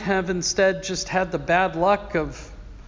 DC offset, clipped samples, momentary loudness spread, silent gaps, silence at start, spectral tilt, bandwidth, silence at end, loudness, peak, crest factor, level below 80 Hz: under 0.1%; under 0.1%; 10 LU; none; 0 s; -4 dB/octave; 7.6 kHz; 0 s; -22 LUFS; -6 dBFS; 16 dB; -42 dBFS